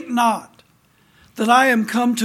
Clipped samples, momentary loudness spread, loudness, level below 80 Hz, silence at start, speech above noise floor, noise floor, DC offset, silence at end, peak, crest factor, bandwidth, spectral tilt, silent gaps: under 0.1%; 10 LU; -17 LUFS; -68 dBFS; 0 s; 40 dB; -57 dBFS; under 0.1%; 0 s; -2 dBFS; 18 dB; 16 kHz; -3.5 dB/octave; none